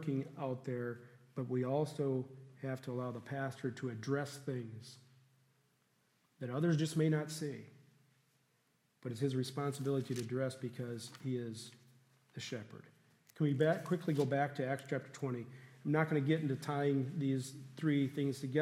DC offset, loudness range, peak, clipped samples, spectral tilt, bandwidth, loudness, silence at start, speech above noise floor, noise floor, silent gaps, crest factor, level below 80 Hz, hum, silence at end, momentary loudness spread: under 0.1%; 6 LU; -18 dBFS; under 0.1%; -7 dB/octave; 15 kHz; -38 LUFS; 0 s; 39 dB; -77 dBFS; none; 20 dB; -84 dBFS; none; 0 s; 14 LU